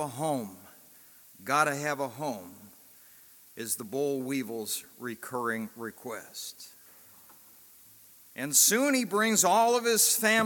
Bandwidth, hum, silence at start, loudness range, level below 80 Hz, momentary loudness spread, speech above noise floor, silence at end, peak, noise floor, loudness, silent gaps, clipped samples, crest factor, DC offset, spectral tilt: 17.5 kHz; none; 0 s; 13 LU; -82 dBFS; 20 LU; 27 dB; 0 s; -8 dBFS; -55 dBFS; -27 LUFS; none; under 0.1%; 22 dB; under 0.1%; -2 dB/octave